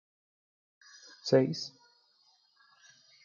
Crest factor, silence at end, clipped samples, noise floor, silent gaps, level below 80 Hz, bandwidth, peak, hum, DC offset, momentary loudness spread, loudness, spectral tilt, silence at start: 24 dB; 1.55 s; under 0.1%; -69 dBFS; none; -82 dBFS; 7.2 kHz; -12 dBFS; none; under 0.1%; 25 LU; -30 LUFS; -6 dB/octave; 1.25 s